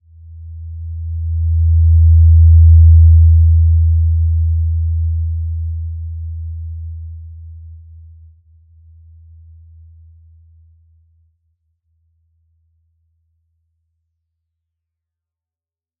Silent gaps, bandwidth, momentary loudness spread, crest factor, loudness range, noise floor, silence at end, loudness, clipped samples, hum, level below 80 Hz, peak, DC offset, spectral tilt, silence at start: none; 0.3 kHz; 23 LU; 14 dB; 22 LU; under -90 dBFS; 8.25 s; -12 LUFS; under 0.1%; none; -22 dBFS; -2 dBFS; under 0.1%; -18.5 dB/octave; 0.3 s